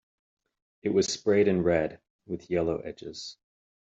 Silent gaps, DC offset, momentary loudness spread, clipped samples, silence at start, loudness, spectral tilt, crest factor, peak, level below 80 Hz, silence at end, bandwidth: 2.10-2.19 s; under 0.1%; 16 LU; under 0.1%; 0.85 s; -27 LUFS; -5 dB/octave; 18 dB; -12 dBFS; -60 dBFS; 0.5 s; 8 kHz